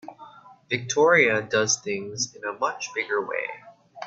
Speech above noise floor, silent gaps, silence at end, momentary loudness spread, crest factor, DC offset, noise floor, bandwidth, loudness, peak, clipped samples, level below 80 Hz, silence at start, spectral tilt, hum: 24 dB; none; 0 s; 13 LU; 20 dB; under 0.1%; -48 dBFS; 8 kHz; -24 LUFS; -6 dBFS; under 0.1%; -68 dBFS; 0.05 s; -2.5 dB/octave; none